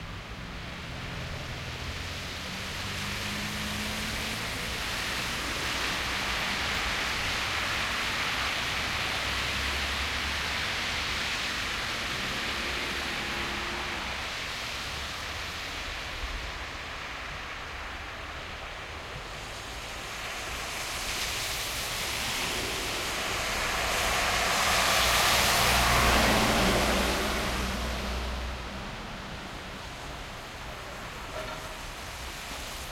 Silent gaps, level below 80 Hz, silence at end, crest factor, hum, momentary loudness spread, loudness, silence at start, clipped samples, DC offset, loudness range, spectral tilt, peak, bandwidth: none; -42 dBFS; 0 s; 22 dB; none; 15 LU; -29 LUFS; 0 s; under 0.1%; under 0.1%; 13 LU; -2.5 dB/octave; -10 dBFS; 16.5 kHz